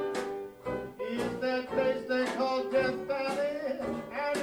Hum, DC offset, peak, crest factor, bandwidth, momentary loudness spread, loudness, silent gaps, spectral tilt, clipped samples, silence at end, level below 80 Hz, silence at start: none; under 0.1%; -16 dBFS; 16 dB; 16.5 kHz; 8 LU; -32 LUFS; none; -5 dB/octave; under 0.1%; 0 s; -62 dBFS; 0 s